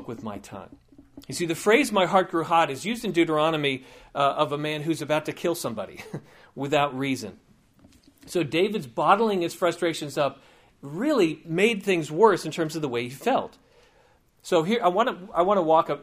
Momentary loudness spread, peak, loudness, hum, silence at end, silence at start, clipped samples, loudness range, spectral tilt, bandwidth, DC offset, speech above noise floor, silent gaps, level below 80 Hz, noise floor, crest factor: 16 LU; -4 dBFS; -24 LUFS; none; 0 s; 0 s; under 0.1%; 5 LU; -5 dB/octave; 15.5 kHz; under 0.1%; 36 dB; none; -64 dBFS; -61 dBFS; 22 dB